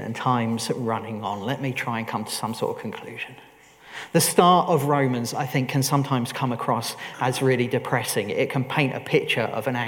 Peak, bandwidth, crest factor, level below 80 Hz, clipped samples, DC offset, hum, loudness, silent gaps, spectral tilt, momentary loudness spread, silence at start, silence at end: -2 dBFS; 19 kHz; 22 dB; -68 dBFS; under 0.1%; under 0.1%; none; -24 LUFS; none; -5 dB/octave; 11 LU; 0 s; 0 s